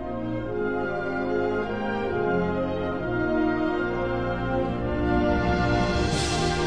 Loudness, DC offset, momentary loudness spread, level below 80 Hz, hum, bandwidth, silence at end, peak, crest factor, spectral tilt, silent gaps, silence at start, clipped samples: -26 LUFS; under 0.1%; 5 LU; -36 dBFS; none; 10.5 kHz; 0 s; -12 dBFS; 14 dB; -6 dB/octave; none; 0 s; under 0.1%